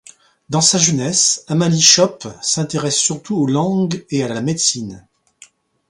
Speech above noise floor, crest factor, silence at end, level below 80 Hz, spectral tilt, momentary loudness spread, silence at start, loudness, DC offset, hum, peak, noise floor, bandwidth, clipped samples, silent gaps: 32 dB; 18 dB; 0.9 s; -56 dBFS; -3 dB/octave; 11 LU; 0.5 s; -15 LUFS; under 0.1%; none; 0 dBFS; -48 dBFS; 16 kHz; under 0.1%; none